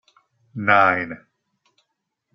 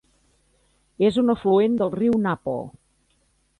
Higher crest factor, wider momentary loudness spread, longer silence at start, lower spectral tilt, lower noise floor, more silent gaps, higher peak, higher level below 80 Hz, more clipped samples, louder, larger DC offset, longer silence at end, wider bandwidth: first, 22 dB vs 14 dB; first, 23 LU vs 11 LU; second, 0.55 s vs 1 s; second, -3 dB/octave vs -8 dB/octave; first, -77 dBFS vs -66 dBFS; neither; first, -2 dBFS vs -8 dBFS; second, -68 dBFS vs -58 dBFS; neither; first, -18 LUFS vs -22 LUFS; neither; first, 1.2 s vs 0.9 s; second, 6.4 kHz vs 10.5 kHz